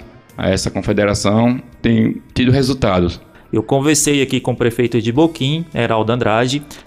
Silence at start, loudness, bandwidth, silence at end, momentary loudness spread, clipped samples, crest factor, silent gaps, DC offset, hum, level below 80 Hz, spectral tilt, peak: 0 s; -16 LUFS; 15.5 kHz; 0.05 s; 5 LU; under 0.1%; 12 dB; none; under 0.1%; none; -38 dBFS; -5 dB/octave; -4 dBFS